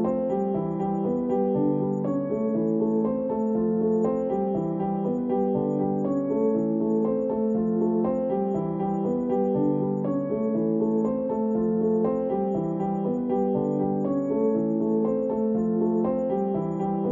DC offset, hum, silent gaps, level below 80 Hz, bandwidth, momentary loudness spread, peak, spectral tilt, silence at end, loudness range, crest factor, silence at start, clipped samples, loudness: under 0.1%; none; none; -58 dBFS; 7.2 kHz; 3 LU; -12 dBFS; -11.5 dB/octave; 0 s; 1 LU; 12 dB; 0 s; under 0.1%; -25 LUFS